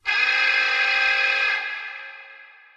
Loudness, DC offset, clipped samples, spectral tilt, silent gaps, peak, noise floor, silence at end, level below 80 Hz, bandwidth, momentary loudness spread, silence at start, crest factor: -19 LUFS; under 0.1%; under 0.1%; 1.5 dB/octave; none; -8 dBFS; -47 dBFS; 0.3 s; -64 dBFS; 10.5 kHz; 16 LU; 0.05 s; 16 dB